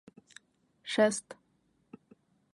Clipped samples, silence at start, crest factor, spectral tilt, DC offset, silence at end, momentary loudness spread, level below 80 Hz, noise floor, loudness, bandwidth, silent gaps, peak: under 0.1%; 0.85 s; 24 dB; -3.5 dB/octave; under 0.1%; 1.2 s; 26 LU; -84 dBFS; -73 dBFS; -30 LUFS; 11.5 kHz; none; -12 dBFS